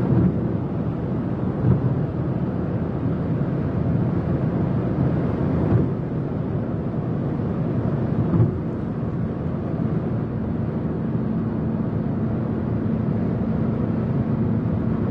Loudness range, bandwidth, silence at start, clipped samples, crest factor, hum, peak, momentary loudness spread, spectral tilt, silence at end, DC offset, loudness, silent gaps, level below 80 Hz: 2 LU; 5 kHz; 0 s; under 0.1%; 16 dB; none; -6 dBFS; 5 LU; -11.5 dB/octave; 0 s; under 0.1%; -23 LUFS; none; -40 dBFS